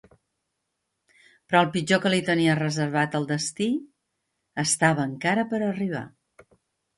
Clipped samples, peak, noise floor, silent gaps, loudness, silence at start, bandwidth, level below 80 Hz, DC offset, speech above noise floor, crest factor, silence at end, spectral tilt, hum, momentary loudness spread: under 0.1%; -6 dBFS; -79 dBFS; none; -24 LUFS; 1.5 s; 11.5 kHz; -66 dBFS; under 0.1%; 56 dB; 20 dB; 0.9 s; -4.5 dB/octave; none; 9 LU